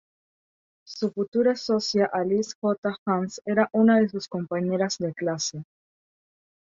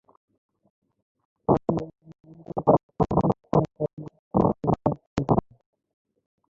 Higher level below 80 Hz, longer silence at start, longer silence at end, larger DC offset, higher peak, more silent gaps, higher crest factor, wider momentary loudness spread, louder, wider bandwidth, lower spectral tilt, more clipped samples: second, -70 dBFS vs -48 dBFS; second, 0.9 s vs 1.5 s; second, 1 s vs 1.15 s; neither; about the same, -8 dBFS vs -6 dBFS; second, 1.28-1.32 s, 2.55-2.62 s, 2.78-2.83 s, 2.99-3.06 s vs 2.83-2.89 s, 3.93-3.97 s, 4.19-4.31 s, 5.07-5.16 s; about the same, 18 dB vs 22 dB; about the same, 10 LU vs 10 LU; about the same, -25 LUFS vs -25 LUFS; about the same, 7.6 kHz vs 7.4 kHz; second, -5 dB/octave vs -10 dB/octave; neither